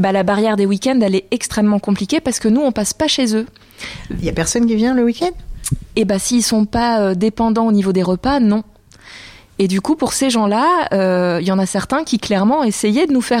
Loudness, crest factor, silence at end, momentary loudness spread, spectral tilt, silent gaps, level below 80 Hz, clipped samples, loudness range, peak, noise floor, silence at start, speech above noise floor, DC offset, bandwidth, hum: -16 LUFS; 10 dB; 0 s; 8 LU; -5 dB/octave; none; -38 dBFS; under 0.1%; 2 LU; -6 dBFS; -40 dBFS; 0 s; 25 dB; under 0.1%; 15.5 kHz; none